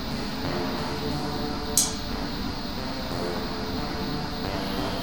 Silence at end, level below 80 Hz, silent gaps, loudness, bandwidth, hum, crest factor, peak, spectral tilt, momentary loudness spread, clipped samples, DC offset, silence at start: 0 s; -40 dBFS; none; -29 LUFS; 19 kHz; none; 24 dB; -6 dBFS; -3.5 dB/octave; 8 LU; under 0.1%; 1%; 0 s